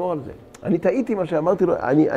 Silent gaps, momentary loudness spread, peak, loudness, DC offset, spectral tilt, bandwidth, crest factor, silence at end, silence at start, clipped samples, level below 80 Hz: none; 12 LU; -6 dBFS; -21 LUFS; under 0.1%; -8.5 dB/octave; 9 kHz; 14 dB; 0 s; 0 s; under 0.1%; -52 dBFS